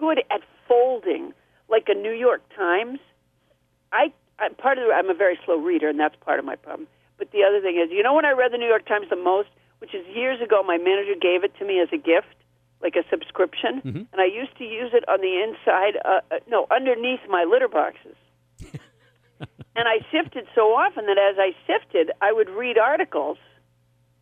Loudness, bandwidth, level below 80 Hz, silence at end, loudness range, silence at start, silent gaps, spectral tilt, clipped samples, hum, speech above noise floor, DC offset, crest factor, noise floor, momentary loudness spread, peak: -22 LUFS; 3.9 kHz; -66 dBFS; 0.85 s; 3 LU; 0 s; none; -6.5 dB/octave; under 0.1%; none; 44 dB; under 0.1%; 16 dB; -65 dBFS; 12 LU; -6 dBFS